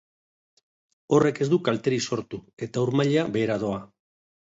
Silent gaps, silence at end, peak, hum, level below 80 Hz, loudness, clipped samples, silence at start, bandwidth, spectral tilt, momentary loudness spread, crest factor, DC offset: 2.53-2.57 s; 0.65 s; -6 dBFS; none; -62 dBFS; -25 LUFS; under 0.1%; 1.1 s; 8 kHz; -6 dB/octave; 11 LU; 20 dB; under 0.1%